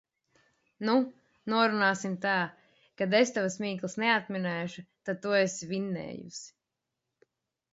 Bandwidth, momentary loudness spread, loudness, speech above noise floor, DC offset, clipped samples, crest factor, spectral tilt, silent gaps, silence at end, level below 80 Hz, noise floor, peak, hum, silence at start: 8 kHz; 15 LU; -29 LUFS; 57 dB; under 0.1%; under 0.1%; 22 dB; -4.5 dB/octave; none; 1.25 s; -76 dBFS; -86 dBFS; -10 dBFS; none; 0.8 s